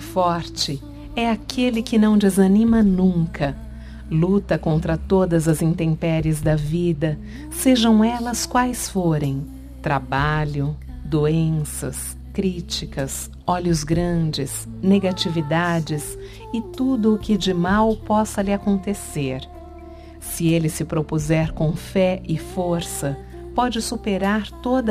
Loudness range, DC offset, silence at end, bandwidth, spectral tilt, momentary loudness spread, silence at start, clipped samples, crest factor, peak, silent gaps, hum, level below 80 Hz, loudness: 5 LU; under 0.1%; 0 s; 15.5 kHz; -6 dB/octave; 12 LU; 0 s; under 0.1%; 16 dB; -4 dBFS; none; none; -36 dBFS; -21 LUFS